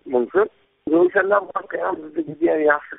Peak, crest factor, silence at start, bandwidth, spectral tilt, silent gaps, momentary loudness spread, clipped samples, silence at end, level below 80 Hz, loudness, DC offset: -2 dBFS; 18 dB; 0.05 s; 3.9 kHz; 0.5 dB/octave; none; 11 LU; under 0.1%; 0 s; -62 dBFS; -20 LUFS; under 0.1%